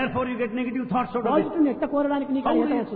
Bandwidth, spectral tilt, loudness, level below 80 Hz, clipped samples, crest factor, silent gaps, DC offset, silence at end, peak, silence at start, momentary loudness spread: 4.5 kHz; -10.5 dB/octave; -24 LUFS; -54 dBFS; under 0.1%; 14 dB; none; under 0.1%; 0 s; -10 dBFS; 0 s; 4 LU